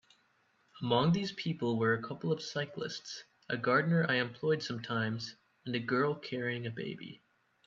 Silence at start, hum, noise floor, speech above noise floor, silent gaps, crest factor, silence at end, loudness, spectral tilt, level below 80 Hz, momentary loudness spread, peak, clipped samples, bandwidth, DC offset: 0.75 s; none; -72 dBFS; 39 dB; none; 20 dB; 0.5 s; -34 LUFS; -6 dB/octave; -74 dBFS; 13 LU; -14 dBFS; under 0.1%; 7.6 kHz; under 0.1%